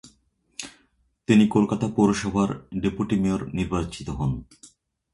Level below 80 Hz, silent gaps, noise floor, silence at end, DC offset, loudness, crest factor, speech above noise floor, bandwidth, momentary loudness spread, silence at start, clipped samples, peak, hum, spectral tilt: -44 dBFS; none; -66 dBFS; 0.5 s; under 0.1%; -24 LUFS; 20 dB; 43 dB; 11.5 kHz; 19 LU; 0.05 s; under 0.1%; -6 dBFS; none; -6.5 dB/octave